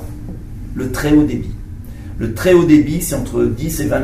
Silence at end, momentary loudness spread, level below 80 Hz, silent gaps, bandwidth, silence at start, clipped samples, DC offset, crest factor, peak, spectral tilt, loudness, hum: 0 s; 20 LU; -30 dBFS; none; 16 kHz; 0 s; under 0.1%; under 0.1%; 16 dB; 0 dBFS; -6 dB/octave; -15 LUFS; none